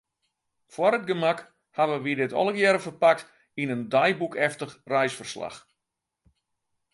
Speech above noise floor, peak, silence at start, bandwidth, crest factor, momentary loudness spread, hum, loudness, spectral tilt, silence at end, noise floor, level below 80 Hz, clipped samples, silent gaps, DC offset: 59 dB; -6 dBFS; 0.75 s; 11.5 kHz; 20 dB; 14 LU; none; -25 LUFS; -5 dB/octave; 1.35 s; -84 dBFS; -74 dBFS; under 0.1%; none; under 0.1%